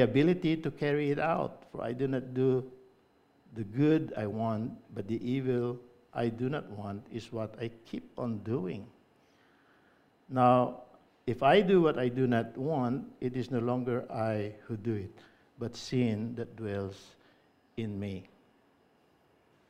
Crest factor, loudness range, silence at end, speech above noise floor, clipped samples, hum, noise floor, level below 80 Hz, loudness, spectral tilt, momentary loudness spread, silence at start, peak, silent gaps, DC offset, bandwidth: 22 dB; 10 LU; 1.45 s; 36 dB; under 0.1%; none; -67 dBFS; -66 dBFS; -32 LUFS; -8 dB/octave; 16 LU; 0 s; -10 dBFS; none; under 0.1%; 11 kHz